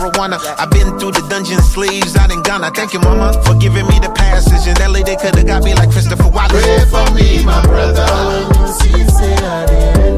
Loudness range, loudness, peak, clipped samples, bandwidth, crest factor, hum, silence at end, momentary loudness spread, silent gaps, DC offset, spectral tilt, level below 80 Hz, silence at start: 2 LU; -12 LUFS; 0 dBFS; under 0.1%; 15.5 kHz; 10 dB; none; 0 s; 5 LU; none; under 0.1%; -5.5 dB/octave; -12 dBFS; 0 s